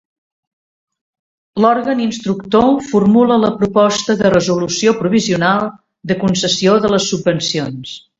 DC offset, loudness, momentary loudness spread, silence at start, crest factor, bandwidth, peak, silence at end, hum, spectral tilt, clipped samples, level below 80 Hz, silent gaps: under 0.1%; -14 LUFS; 9 LU; 1.55 s; 14 dB; 8 kHz; 0 dBFS; 0.2 s; none; -5 dB/octave; under 0.1%; -48 dBFS; none